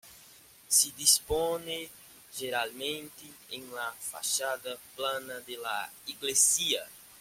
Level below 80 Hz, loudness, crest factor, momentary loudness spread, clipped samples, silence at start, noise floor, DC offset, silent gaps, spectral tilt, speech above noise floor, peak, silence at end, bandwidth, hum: -58 dBFS; -29 LUFS; 24 dB; 19 LU; under 0.1%; 0.05 s; -56 dBFS; under 0.1%; none; 0 dB/octave; 24 dB; -8 dBFS; 0 s; 16.5 kHz; none